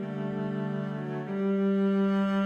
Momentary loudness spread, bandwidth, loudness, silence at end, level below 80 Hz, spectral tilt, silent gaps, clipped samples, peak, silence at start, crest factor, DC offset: 8 LU; 5.2 kHz; -29 LUFS; 0 s; -68 dBFS; -9 dB/octave; none; under 0.1%; -18 dBFS; 0 s; 10 dB; under 0.1%